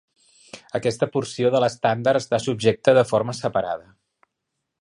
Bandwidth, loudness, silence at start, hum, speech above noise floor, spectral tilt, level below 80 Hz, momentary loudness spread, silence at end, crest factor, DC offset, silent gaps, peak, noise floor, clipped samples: 11 kHz; -21 LUFS; 0.55 s; none; 59 dB; -5.5 dB/octave; -60 dBFS; 8 LU; 1 s; 20 dB; under 0.1%; none; -2 dBFS; -80 dBFS; under 0.1%